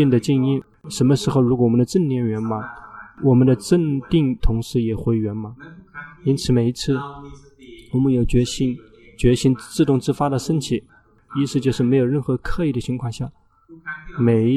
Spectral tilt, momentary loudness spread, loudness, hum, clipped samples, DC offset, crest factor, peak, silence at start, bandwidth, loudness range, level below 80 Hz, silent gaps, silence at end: -7 dB/octave; 15 LU; -20 LUFS; none; under 0.1%; under 0.1%; 16 dB; -4 dBFS; 0 s; 13.5 kHz; 4 LU; -34 dBFS; none; 0 s